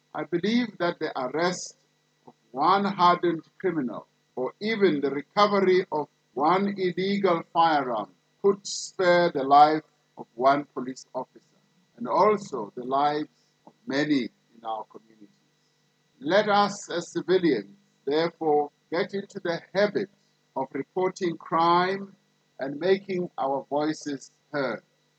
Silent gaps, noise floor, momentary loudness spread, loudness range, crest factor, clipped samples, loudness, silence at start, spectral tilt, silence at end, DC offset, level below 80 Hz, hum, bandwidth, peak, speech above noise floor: none; -68 dBFS; 15 LU; 5 LU; 20 dB; under 0.1%; -26 LUFS; 0.15 s; -5 dB/octave; 0.4 s; under 0.1%; -84 dBFS; none; 8.8 kHz; -6 dBFS; 43 dB